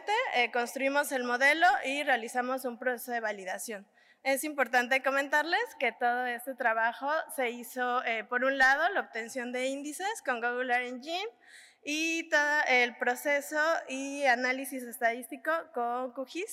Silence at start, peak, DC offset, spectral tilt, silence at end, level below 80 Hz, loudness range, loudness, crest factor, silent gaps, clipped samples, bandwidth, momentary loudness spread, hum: 0 s; -14 dBFS; under 0.1%; -1 dB/octave; 0 s; -78 dBFS; 3 LU; -30 LUFS; 16 dB; none; under 0.1%; 16 kHz; 11 LU; none